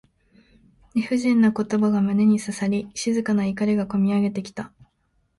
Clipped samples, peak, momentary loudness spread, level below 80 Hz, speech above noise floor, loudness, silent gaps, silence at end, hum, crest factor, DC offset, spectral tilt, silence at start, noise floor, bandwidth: under 0.1%; -8 dBFS; 10 LU; -58 dBFS; 47 dB; -22 LUFS; none; 0.7 s; none; 14 dB; under 0.1%; -6.5 dB/octave; 0.95 s; -68 dBFS; 11.5 kHz